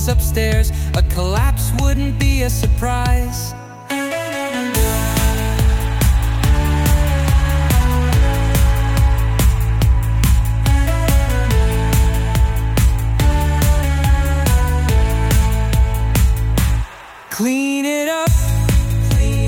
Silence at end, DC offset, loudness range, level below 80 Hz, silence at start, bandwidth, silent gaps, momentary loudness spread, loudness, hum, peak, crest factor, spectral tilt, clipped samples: 0 s; under 0.1%; 3 LU; -16 dBFS; 0 s; 17.5 kHz; none; 4 LU; -17 LUFS; none; -2 dBFS; 12 dB; -5.5 dB/octave; under 0.1%